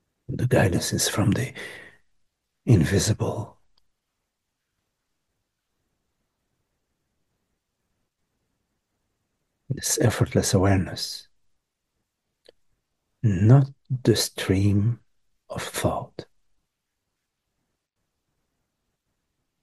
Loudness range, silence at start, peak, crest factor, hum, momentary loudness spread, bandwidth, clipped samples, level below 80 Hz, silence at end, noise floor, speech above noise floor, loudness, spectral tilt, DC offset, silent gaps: 11 LU; 0.3 s; -4 dBFS; 22 dB; none; 17 LU; 12.5 kHz; under 0.1%; -52 dBFS; 3.4 s; -80 dBFS; 58 dB; -23 LUFS; -5.5 dB/octave; under 0.1%; none